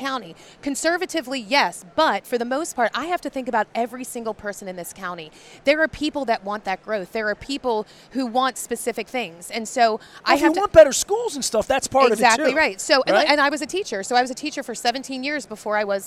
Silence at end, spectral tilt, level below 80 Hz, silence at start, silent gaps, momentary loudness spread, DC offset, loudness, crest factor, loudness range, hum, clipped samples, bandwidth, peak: 0 s; -2.5 dB/octave; -52 dBFS; 0 s; none; 13 LU; under 0.1%; -21 LUFS; 22 dB; 8 LU; none; under 0.1%; 15.5 kHz; 0 dBFS